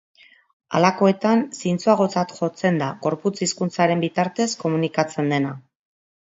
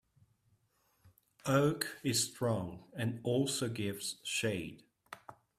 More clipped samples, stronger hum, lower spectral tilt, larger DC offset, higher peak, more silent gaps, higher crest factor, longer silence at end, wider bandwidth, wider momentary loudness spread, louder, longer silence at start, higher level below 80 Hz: neither; neither; first, -5.5 dB/octave vs -4 dB/octave; neither; first, -2 dBFS vs -14 dBFS; neither; about the same, 20 dB vs 22 dB; first, 0.65 s vs 0.25 s; second, 8 kHz vs 15.5 kHz; second, 7 LU vs 18 LU; first, -21 LUFS vs -35 LUFS; second, 0.7 s vs 1.05 s; about the same, -66 dBFS vs -70 dBFS